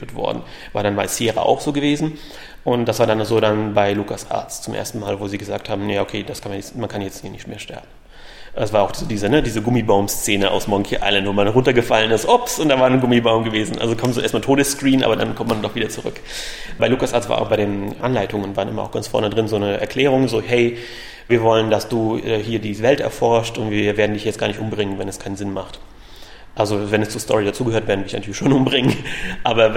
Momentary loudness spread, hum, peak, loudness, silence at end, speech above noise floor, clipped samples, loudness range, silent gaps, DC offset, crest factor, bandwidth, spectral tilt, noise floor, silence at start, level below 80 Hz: 12 LU; none; 0 dBFS; -19 LUFS; 0 s; 20 dB; under 0.1%; 7 LU; none; under 0.1%; 18 dB; 16.5 kHz; -5 dB/octave; -38 dBFS; 0 s; -40 dBFS